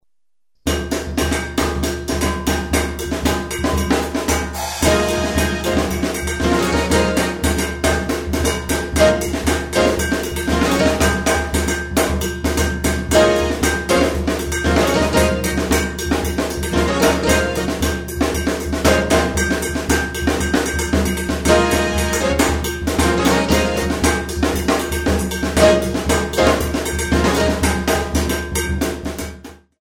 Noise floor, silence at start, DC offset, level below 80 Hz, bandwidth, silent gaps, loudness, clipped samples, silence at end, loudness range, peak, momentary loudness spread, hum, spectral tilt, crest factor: -84 dBFS; 0.65 s; 0.1%; -26 dBFS; 18.5 kHz; none; -18 LUFS; under 0.1%; 0.25 s; 2 LU; 0 dBFS; 6 LU; none; -4.5 dB/octave; 18 dB